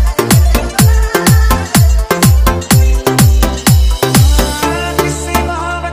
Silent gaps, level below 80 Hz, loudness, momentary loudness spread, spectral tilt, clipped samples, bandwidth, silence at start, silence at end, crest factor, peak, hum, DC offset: none; -14 dBFS; -11 LUFS; 5 LU; -5 dB/octave; 0.2%; 16.5 kHz; 0 s; 0 s; 10 dB; 0 dBFS; none; under 0.1%